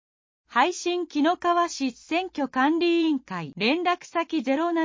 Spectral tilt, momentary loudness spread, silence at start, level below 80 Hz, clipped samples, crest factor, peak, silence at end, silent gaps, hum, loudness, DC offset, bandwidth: -4 dB/octave; 6 LU; 0.5 s; -70 dBFS; under 0.1%; 18 dB; -6 dBFS; 0 s; none; none; -25 LUFS; under 0.1%; 7.6 kHz